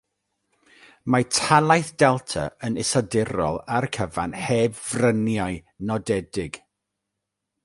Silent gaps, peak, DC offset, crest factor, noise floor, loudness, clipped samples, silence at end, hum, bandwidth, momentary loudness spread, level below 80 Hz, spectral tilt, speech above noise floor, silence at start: none; -2 dBFS; under 0.1%; 22 dB; -82 dBFS; -23 LUFS; under 0.1%; 1.05 s; none; 11.5 kHz; 12 LU; -50 dBFS; -4.5 dB/octave; 59 dB; 1.05 s